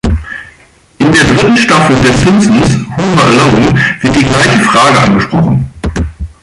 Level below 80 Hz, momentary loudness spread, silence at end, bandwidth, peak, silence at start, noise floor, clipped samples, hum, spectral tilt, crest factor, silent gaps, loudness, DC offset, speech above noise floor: -24 dBFS; 11 LU; 0.15 s; 11.5 kHz; 0 dBFS; 0.05 s; -42 dBFS; under 0.1%; none; -5 dB/octave; 8 dB; none; -8 LUFS; under 0.1%; 35 dB